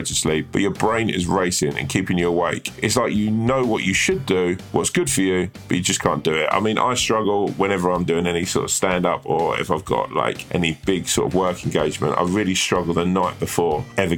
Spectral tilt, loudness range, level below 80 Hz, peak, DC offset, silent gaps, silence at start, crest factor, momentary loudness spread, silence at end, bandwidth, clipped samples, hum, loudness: -4 dB/octave; 1 LU; -46 dBFS; 0 dBFS; under 0.1%; none; 0 s; 20 dB; 3 LU; 0 s; 18 kHz; under 0.1%; none; -20 LUFS